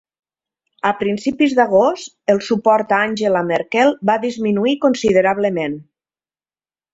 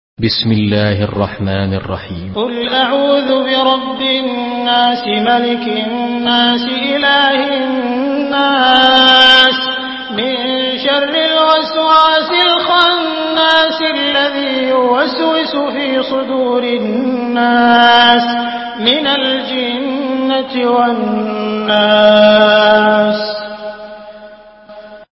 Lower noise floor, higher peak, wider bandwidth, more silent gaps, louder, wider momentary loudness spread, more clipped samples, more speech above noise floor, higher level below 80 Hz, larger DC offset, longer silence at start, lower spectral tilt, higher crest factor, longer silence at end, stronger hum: first, under -90 dBFS vs -36 dBFS; about the same, -2 dBFS vs 0 dBFS; about the same, 8 kHz vs 8 kHz; neither; second, -17 LUFS vs -11 LUFS; second, 6 LU vs 10 LU; second, under 0.1% vs 0.1%; first, over 74 dB vs 25 dB; second, -56 dBFS vs -44 dBFS; neither; first, 0.85 s vs 0.2 s; about the same, -5.5 dB/octave vs -6 dB/octave; about the same, 16 dB vs 12 dB; first, 1.1 s vs 0.1 s; neither